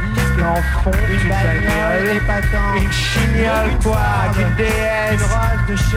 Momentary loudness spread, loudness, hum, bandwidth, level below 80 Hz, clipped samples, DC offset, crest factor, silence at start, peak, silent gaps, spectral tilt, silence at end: 1 LU; -16 LUFS; none; 16 kHz; -20 dBFS; under 0.1%; under 0.1%; 12 dB; 0 s; -4 dBFS; none; -5.5 dB/octave; 0 s